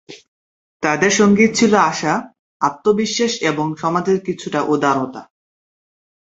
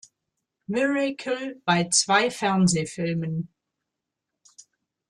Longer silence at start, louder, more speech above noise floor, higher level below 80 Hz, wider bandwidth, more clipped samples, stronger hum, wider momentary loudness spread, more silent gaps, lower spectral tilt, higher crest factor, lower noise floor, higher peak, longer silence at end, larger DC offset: second, 0.1 s vs 0.7 s; first, -17 LUFS vs -24 LUFS; first, over 74 dB vs 61 dB; first, -58 dBFS vs -66 dBFS; second, 8 kHz vs 12 kHz; neither; neither; about the same, 9 LU vs 11 LU; first, 0.28-0.80 s, 2.39-2.60 s vs none; about the same, -4.5 dB/octave vs -4 dB/octave; about the same, 18 dB vs 22 dB; first, under -90 dBFS vs -84 dBFS; first, 0 dBFS vs -6 dBFS; first, 1.15 s vs 0.5 s; neither